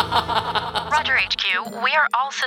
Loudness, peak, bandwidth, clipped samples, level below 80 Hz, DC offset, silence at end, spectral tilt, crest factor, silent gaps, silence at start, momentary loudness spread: -20 LUFS; -4 dBFS; 17.5 kHz; under 0.1%; -50 dBFS; under 0.1%; 0 s; -2.5 dB/octave; 16 dB; none; 0 s; 4 LU